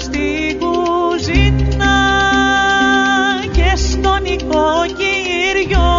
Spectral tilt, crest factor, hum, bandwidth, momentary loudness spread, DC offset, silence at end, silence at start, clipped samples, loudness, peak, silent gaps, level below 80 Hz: -3.5 dB/octave; 14 dB; none; 7.6 kHz; 5 LU; under 0.1%; 0 s; 0 s; under 0.1%; -14 LUFS; 0 dBFS; none; -20 dBFS